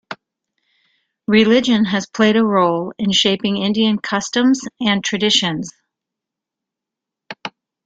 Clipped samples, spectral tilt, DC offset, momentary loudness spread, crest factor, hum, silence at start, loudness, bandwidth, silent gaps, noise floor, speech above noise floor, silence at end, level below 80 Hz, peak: under 0.1%; -4 dB/octave; under 0.1%; 18 LU; 16 dB; none; 0.1 s; -16 LUFS; 9 kHz; none; -84 dBFS; 68 dB; 0.35 s; -58 dBFS; -2 dBFS